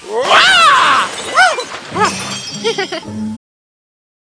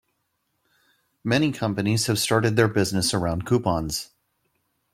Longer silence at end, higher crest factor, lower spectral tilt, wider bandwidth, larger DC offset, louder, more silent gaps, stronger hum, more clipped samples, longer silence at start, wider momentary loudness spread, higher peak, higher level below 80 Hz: first, 1.05 s vs 0.9 s; second, 14 dB vs 20 dB; second, -1.5 dB/octave vs -4.5 dB/octave; second, 11 kHz vs 16 kHz; neither; first, -11 LUFS vs -23 LUFS; neither; neither; first, 0.2% vs under 0.1%; second, 0 s vs 1.25 s; first, 16 LU vs 9 LU; first, 0 dBFS vs -4 dBFS; about the same, -54 dBFS vs -50 dBFS